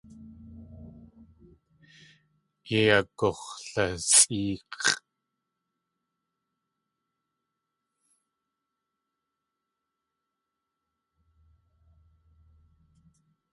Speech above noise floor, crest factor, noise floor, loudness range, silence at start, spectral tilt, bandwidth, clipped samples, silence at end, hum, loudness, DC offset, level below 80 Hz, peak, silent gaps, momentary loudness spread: 59 dB; 30 dB; -85 dBFS; 10 LU; 0.2 s; -2 dB/octave; 11.5 kHz; under 0.1%; 8.55 s; none; -24 LUFS; under 0.1%; -60 dBFS; -4 dBFS; none; 29 LU